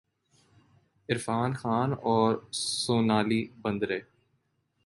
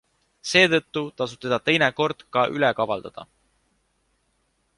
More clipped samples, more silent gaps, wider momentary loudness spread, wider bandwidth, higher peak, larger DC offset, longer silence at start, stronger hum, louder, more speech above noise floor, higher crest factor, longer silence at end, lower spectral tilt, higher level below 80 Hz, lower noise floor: neither; neither; second, 8 LU vs 13 LU; about the same, 11.5 kHz vs 11.5 kHz; second, -10 dBFS vs -4 dBFS; neither; first, 1.1 s vs 0.45 s; neither; second, -28 LUFS vs -22 LUFS; about the same, 47 dB vs 47 dB; about the same, 20 dB vs 22 dB; second, 0.85 s vs 1.55 s; about the same, -5 dB/octave vs -4 dB/octave; about the same, -64 dBFS vs -62 dBFS; first, -75 dBFS vs -70 dBFS